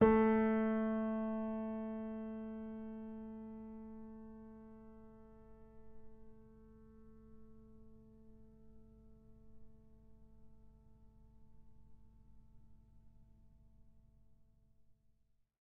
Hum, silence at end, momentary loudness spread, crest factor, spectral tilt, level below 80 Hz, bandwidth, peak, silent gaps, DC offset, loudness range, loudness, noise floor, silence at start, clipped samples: none; 0.7 s; 29 LU; 26 dB; -7.5 dB/octave; -64 dBFS; 3.6 kHz; -16 dBFS; none; under 0.1%; 27 LU; -39 LUFS; -74 dBFS; 0 s; under 0.1%